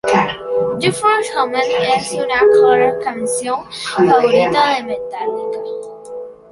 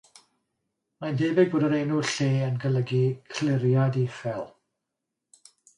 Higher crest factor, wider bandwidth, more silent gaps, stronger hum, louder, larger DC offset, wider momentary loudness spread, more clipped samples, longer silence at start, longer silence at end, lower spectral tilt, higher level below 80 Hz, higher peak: about the same, 14 dB vs 18 dB; about the same, 11.5 kHz vs 10.5 kHz; neither; neither; first, -15 LUFS vs -25 LUFS; neither; first, 14 LU vs 11 LU; neither; second, 0.05 s vs 1 s; second, 0.2 s vs 1.3 s; second, -4 dB/octave vs -6.5 dB/octave; first, -52 dBFS vs -68 dBFS; first, 0 dBFS vs -8 dBFS